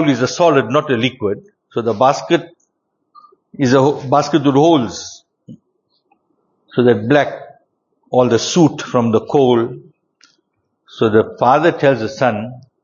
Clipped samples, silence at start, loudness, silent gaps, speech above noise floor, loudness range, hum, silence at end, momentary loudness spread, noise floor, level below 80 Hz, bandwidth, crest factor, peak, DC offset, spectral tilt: under 0.1%; 0 s; -15 LUFS; none; 56 dB; 3 LU; none; 0.25 s; 12 LU; -70 dBFS; -56 dBFS; 7.6 kHz; 16 dB; 0 dBFS; under 0.1%; -5.5 dB/octave